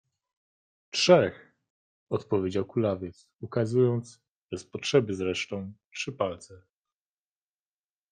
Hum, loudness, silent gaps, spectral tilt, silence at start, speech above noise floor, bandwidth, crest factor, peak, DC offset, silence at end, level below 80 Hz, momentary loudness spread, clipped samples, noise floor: none; -28 LUFS; 1.70-2.07 s, 4.31-4.49 s, 5.85-5.91 s; -5.5 dB/octave; 0.95 s; over 63 dB; 9.6 kHz; 24 dB; -6 dBFS; under 0.1%; 1.55 s; -70 dBFS; 19 LU; under 0.1%; under -90 dBFS